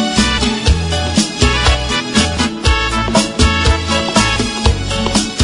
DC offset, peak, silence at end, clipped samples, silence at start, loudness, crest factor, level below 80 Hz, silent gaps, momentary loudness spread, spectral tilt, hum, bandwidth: under 0.1%; 0 dBFS; 0 s; under 0.1%; 0 s; -14 LUFS; 14 dB; -20 dBFS; none; 3 LU; -4 dB/octave; none; 11 kHz